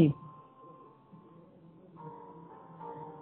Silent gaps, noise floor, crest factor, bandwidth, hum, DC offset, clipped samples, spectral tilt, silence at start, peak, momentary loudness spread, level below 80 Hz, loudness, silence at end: none; -57 dBFS; 26 dB; 3.7 kHz; none; under 0.1%; under 0.1%; -9 dB/octave; 0 s; -12 dBFS; 13 LU; -72 dBFS; -39 LUFS; 0 s